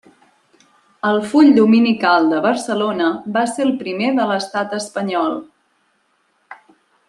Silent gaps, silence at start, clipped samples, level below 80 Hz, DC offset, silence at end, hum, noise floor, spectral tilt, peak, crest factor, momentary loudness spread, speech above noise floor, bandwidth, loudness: none; 1.05 s; under 0.1%; -66 dBFS; under 0.1%; 0.55 s; none; -63 dBFS; -5 dB/octave; -2 dBFS; 16 dB; 11 LU; 47 dB; 11.5 kHz; -16 LUFS